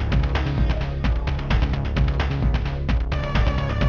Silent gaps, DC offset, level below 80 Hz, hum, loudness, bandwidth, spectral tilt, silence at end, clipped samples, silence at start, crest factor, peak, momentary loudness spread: none; 0.2%; -22 dBFS; none; -23 LUFS; 6.6 kHz; -7.5 dB/octave; 0 s; under 0.1%; 0 s; 12 dB; -8 dBFS; 2 LU